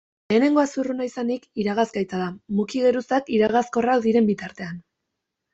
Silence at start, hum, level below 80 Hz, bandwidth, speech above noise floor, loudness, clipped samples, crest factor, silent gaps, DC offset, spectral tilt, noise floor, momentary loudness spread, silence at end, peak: 0.3 s; none; -62 dBFS; 8 kHz; 59 dB; -22 LUFS; under 0.1%; 16 dB; none; under 0.1%; -6 dB/octave; -81 dBFS; 10 LU; 0.75 s; -6 dBFS